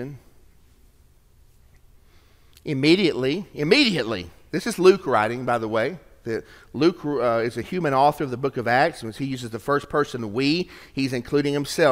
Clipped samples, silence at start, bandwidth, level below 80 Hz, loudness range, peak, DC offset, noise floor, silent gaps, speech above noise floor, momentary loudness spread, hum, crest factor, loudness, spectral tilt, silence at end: under 0.1%; 0 s; 16 kHz; -54 dBFS; 4 LU; -2 dBFS; under 0.1%; -55 dBFS; none; 33 dB; 13 LU; none; 22 dB; -23 LUFS; -5.5 dB/octave; 0 s